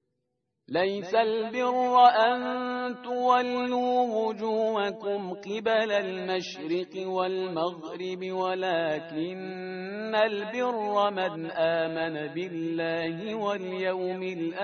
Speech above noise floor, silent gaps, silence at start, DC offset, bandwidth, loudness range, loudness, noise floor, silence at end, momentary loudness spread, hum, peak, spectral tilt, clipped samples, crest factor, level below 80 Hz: 53 dB; none; 0.7 s; under 0.1%; 6.6 kHz; 6 LU; -28 LUFS; -80 dBFS; 0 s; 9 LU; none; -6 dBFS; -5.5 dB/octave; under 0.1%; 20 dB; -74 dBFS